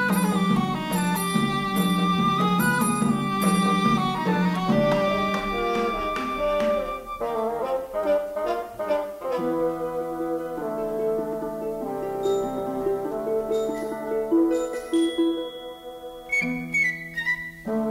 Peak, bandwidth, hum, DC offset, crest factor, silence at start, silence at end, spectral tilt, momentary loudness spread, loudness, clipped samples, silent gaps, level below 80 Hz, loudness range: -8 dBFS; 16 kHz; none; under 0.1%; 16 dB; 0 s; 0 s; -5.5 dB/octave; 8 LU; -25 LUFS; under 0.1%; none; -50 dBFS; 6 LU